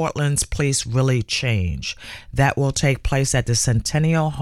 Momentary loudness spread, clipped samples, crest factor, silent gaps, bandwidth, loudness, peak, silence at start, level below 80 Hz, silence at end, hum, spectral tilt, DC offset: 7 LU; under 0.1%; 14 dB; none; 14.5 kHz; -20 LUFS; -6 dBFS; 0 s; -34 dBFS; 0 s; none; -4.5 dB/octave; under 0.1%